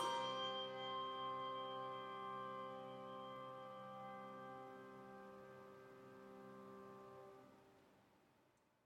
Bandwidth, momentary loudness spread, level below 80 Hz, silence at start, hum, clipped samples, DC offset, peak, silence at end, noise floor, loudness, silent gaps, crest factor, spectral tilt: 16 kHz; 16 LU; under -90 dBFS; 0 s; none; under 0.1%; under 0.1%; -30 dBFS; 0.4 s; -77 dBFS; -50 LUFS; none; 20 dB; -4 dB/octave